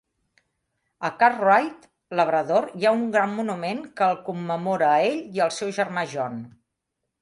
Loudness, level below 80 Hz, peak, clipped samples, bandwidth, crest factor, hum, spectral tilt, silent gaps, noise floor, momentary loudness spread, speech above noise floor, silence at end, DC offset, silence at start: -23 LUFS; -72 dBFS; -4 dBFS; under 0.1%; 11.5 kHz; 20 dB; none; -5 dB/octave; none; -81 dBFS; 11 LU; 58 dB; 0.7 s; under 0.1%; 1 s